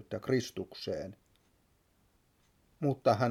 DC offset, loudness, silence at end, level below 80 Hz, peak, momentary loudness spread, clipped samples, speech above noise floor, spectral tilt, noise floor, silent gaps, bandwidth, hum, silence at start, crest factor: under 0.1%; -34 LUFS; 0 s; -70 dBFS; -14 dBFS; 12 LU; under 0.1%; 38 dB; -6.5 dB/octave; -71 dBFS; none; 16 kHz; none; 0.1 s; 22 dB